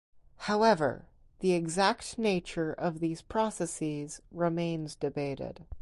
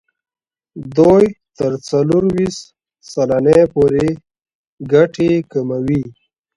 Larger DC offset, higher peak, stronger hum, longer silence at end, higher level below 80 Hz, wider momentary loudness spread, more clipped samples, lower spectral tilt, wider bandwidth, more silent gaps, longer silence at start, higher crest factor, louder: neither; second, -12 dBFS vs 0 dBFS; neither; second, 0 s vs 0.45 s; second, -56 dBFS vs -46 dBFS; second, 12 LU vs 16 LU; neither; second, -5 dB/octave vs -7.5 dB/octave; about the same, 11.5 kHz vs 11.5 kHz; second, none vs 4.55-4.77 s; second, 0.15 s vs 0.75 s; about the same, 20 dB vs 16 dB; second, -31 LUFS vs -15 LUFS